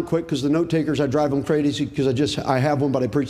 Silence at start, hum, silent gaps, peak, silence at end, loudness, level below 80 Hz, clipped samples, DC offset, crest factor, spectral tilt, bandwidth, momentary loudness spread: 0 s; none; none; -4 dBFS; 0 s; -21 LUFS; -50 dBFS; under 0.1%; under 0.1%; 18 dB; -6.5 dB/octave; 13.5 kHz; 2 LU